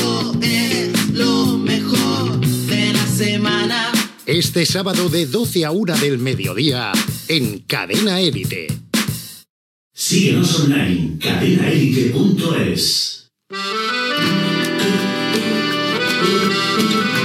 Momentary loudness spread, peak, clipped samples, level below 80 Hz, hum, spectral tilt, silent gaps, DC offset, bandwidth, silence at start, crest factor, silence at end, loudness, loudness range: 5 LU; -2 dBFS; under 0.1%; -50 dBFS; none; -4.5 dB/octave; 9.49-9.91 s; under 0.1%; 17 kHz; 0 s; 16 dB; 0 s; -17 LUFS; 2 LU